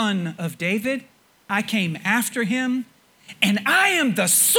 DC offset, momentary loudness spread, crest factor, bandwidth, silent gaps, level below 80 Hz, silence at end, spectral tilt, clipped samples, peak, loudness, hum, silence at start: under 0.1%; 11 LU; 20 dB; over 20 kHz; none; -70 dBFS; 0 s; -2.5 dB/octave; under 0.1%; -2 dBFS; -21 LUFS; none; 0 s